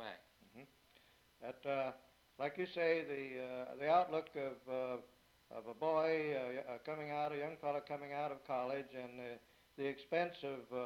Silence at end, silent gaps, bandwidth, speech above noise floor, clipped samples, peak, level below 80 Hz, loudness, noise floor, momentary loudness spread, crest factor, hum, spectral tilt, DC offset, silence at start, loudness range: 0 s; none; 16 kHz; 29 dB; under 0.1%; -22 dBFS; -82 dBFS; -41 LUFS; -70 dBFS; 17 LU; 20 dB; none; -6.5 dB/octave; under 0.1%; 0 s; 4 LU